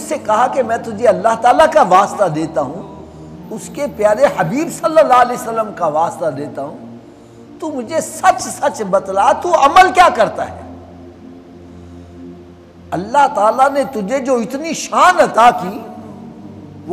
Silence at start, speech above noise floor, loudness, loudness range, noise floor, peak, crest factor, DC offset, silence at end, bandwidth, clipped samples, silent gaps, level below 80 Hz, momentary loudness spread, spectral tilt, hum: 0 s; 25 dB; -13 LUFS; 6 LU; -38 dBFS; 0 dBFS; 14 dB; under 0.1%; 0 s; 15 kHz; under 0.1%; none; -48 dBFS; 23 LU; -4 dB/octave; none